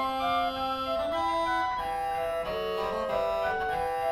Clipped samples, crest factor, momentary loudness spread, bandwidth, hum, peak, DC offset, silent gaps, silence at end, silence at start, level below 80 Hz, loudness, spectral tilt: under 0.1%; 12 dB; 3 LU; 17.5 kHz; none; -16 dBFS; under 0.1%; none; 0 s; 0 s; -52 dBFS; -29 LUFS; -4 dB/octave